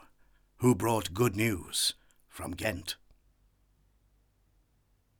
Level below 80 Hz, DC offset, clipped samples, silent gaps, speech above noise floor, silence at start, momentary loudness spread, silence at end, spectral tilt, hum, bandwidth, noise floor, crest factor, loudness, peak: -58 dBFS; under 0.1%; under 0.1%; none; 41 dB; 0.6 s; 15 LU; 2.25 s; -4.5 dB/octave; none; over 20 kHz; -70 dBFS; 20 dB; -30 LUFS; -14 dBFS